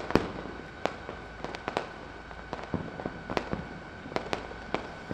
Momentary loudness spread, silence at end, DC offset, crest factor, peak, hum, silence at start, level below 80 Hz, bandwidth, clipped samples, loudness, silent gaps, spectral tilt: 8 LU; 0 s; under 0.1%; 32 dB; -4 dBFS; none; 0 s; -50 dBFS; 13.5 kHz; under 0.1%; -36 LUFS; none; -6 dB/octave